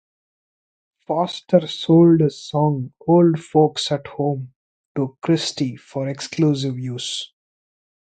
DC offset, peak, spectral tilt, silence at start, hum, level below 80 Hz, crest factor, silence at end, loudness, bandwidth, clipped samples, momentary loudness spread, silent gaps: under 0.1%; 0 dBFS; -6.5 dB/octave; 1.1 s; none; -60 dBFS; 20 dB; 0.85 s; -20 LUFS; 9.2 kHz; under 0.1%; 12 LU; 4.56-4.95 s